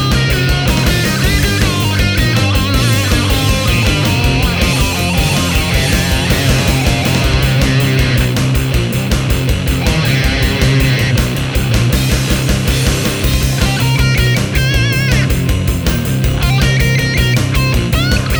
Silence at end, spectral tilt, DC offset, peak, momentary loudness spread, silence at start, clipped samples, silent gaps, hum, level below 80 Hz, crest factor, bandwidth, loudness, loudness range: 0 s; -4.5 dB/octave; under 0.1%; 0 dBFS; 3 LU; 0 s; under 0.1%; none; none; -18 dBFS; 12 dB; over 20 kHz; -13 LUFS; 1 LU